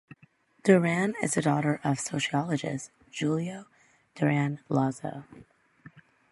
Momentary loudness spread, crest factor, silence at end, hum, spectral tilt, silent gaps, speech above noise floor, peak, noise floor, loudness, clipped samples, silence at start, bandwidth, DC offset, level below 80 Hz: 15 LU; 22 dB; 0.3 s; none; -5.5 dB/octave; none; 35 dB; -6 dBFS; -62 dBFS; -28 LUFS; under 0.1%; 0.65 s; 11.5 kHz; under 0.1%; -68 dBFS